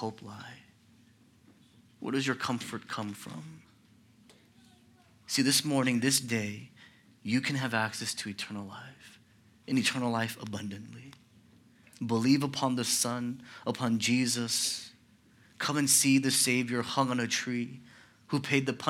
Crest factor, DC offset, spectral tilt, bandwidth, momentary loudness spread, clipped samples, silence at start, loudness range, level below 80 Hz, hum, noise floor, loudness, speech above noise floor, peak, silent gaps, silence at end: 22 dB; under 0.1%; -3 dB/octave; 17.5 kHz; 20 LU; under 0.1%; 0 s; 10 LU; -76 dBFS; none; -62 dBFS; -29 LUFS; 31 dB; -10 dBFS; none; 0 s